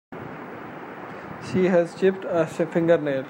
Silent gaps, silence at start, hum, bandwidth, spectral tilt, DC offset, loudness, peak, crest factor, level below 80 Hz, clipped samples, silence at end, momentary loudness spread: none; 0.1 s; none; 16 kHz; -7.5 dB/octave; under 0.1%; -22 LUFS; -6 dBFS; 18 dB; -66 dBFS; under 0.1%; 0 s; 17 LU